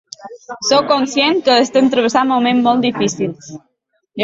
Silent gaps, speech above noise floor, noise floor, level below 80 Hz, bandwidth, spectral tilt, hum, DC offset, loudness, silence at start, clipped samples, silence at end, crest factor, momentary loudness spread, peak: none; 27 dB; -41 dBFS; -60 dBFS; 7.8 kHz; -3.5 dB/octave; none; under 0.1%; -14 LUFS; 0.2 s; under 0.1%; 0 s; 14 dB; 21 LU; -2 dBFS